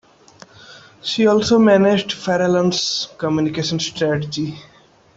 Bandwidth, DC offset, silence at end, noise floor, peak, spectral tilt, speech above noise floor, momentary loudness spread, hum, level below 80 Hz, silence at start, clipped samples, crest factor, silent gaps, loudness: 8 kHz; under 0.1%; 0.55 s; -46 dBFS; -2 dBFS; -5 dB/octave; 29 dB; 12 LU; none; -54 dBFS; 0.7 s; under 0.1%; 16 dB; none; -18 LUFS